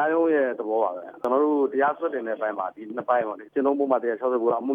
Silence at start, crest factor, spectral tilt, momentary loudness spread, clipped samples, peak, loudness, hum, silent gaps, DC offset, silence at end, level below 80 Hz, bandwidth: 0 s; 16 dB; -8 dB/octave; 7 LU; under 0.1%; -8 dBFS; -25 LUFS; none; none; under 0.1%; 0 s; -78 dBFS; 4.6 kHz